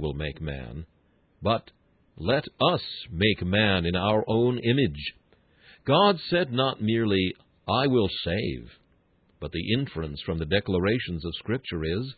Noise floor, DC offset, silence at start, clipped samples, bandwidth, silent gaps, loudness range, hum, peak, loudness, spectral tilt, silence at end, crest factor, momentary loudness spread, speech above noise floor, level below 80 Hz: -64 dBFS; under 0.1%; 0 s; under 0.1%; 4.8 kHz; none; 4 LU; none; -6 dBFS; -26 LUFS; -10.5 dB/octave; 0.05 s; 20 dB; 13 LU; 39 dB; -44 dBFS